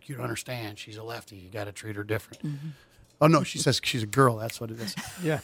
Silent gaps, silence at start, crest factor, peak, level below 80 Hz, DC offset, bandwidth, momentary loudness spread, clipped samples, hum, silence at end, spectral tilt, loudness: none; 0.1 s; 22 dB; -6 dBFS; -62 dBFS; under 0.1%; 17.5 kHz; 17 LU; under 0.1%; none; 0 s; -5 dB/octave; -28 LUFS